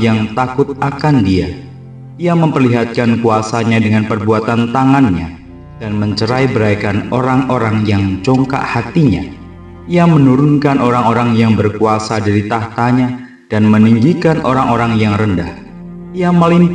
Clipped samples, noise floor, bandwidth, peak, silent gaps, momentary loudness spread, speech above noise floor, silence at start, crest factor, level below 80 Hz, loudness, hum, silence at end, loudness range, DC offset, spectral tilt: under 0.1%; -32 dBFS; 9.6 kHz; 0 dBFS; none; 12 LU; 20 dB; 0 s; 12 dB; -36 dBFS; -12 LUFS; none; 0 s; 2 LU; under 0.1%; -7.5 dB/octave